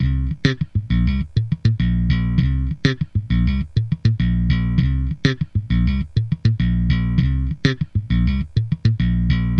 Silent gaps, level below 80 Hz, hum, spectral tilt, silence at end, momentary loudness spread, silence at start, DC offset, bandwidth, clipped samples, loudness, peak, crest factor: none; -24 dBFS; none; -8 dB/octave; 0 s; 3 LU; 0 s; under 0.1%; 6.6 kHz; under 0.1%; -20 LUFS; 0 dBFS; 18 dB